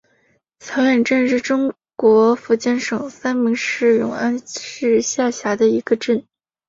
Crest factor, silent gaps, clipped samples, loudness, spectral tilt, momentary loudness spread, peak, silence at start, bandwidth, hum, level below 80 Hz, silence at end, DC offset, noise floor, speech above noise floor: 16 dB; none; under 0.1%; -18 LUFS; -4 dB/octave; 8 LU; -2 dBFS; 0.65 s; 7.8 kHz; none; -62 dBFS; 0.5 s; under 0.1%; -62 dBFS; 44 dB